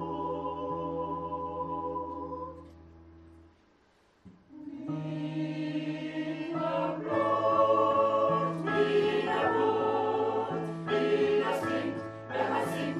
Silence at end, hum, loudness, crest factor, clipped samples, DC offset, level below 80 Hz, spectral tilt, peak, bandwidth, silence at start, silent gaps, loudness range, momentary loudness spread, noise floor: 0 s; none; -30 LUFS; 16 dB; under 0.1%; under 0.1%; -64 dBFS; -6.5 dB/octave; -14 dBFS; 13 kHz; 0 s; none; 14 LU; 11 LU; -65 dBFS